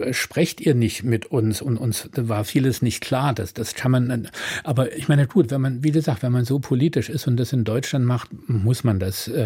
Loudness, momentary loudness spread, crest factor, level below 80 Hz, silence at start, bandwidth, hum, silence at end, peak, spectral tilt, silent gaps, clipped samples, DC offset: -22 LUFS; 5 LU; 16 dB; -56 dBFS; 0 s; 16.5 kHz; none; 0 s; -4 dBFS; -6 dB/octave; none; under 0.1%; under 0.1%